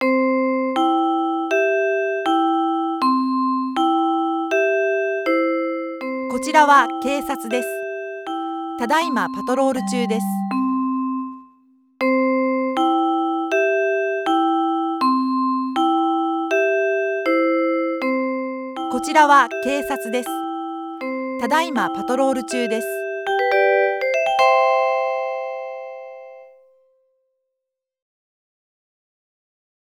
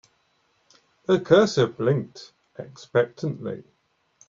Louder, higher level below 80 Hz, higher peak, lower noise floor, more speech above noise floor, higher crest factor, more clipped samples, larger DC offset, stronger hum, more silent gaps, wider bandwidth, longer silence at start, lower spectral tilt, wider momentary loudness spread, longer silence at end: first, -20 LUFS vs -23 LUFS; about the same, -64 dBFS vs -64 dBFS; first, 0 dBFS vs -4 dBFS; first, -82 dBFS vs -67 dBFS; first, 63 dB vs 45 dB; about the same, 20 dB vs 20 dB; neither; neither; neither; neither; first, 17.5 kHz vs 7.6 kHz; second, 0 s vs 1.1 s; second, -4.5 dB/octave vs -6 dB/octave; second, 11 LU vs 23 LU; first, 3.5 s vs 0.65 s